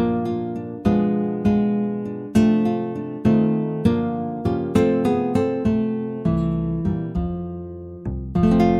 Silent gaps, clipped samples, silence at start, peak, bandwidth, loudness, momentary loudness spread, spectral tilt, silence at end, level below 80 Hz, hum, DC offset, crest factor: none; under 0.1%; 0 s; -4 dBFS; 11 kHz; -22 LUFS; 10 LU; -9 dB/octave; 0 s; -38 dBFS; none; under 0.1%; 16 dB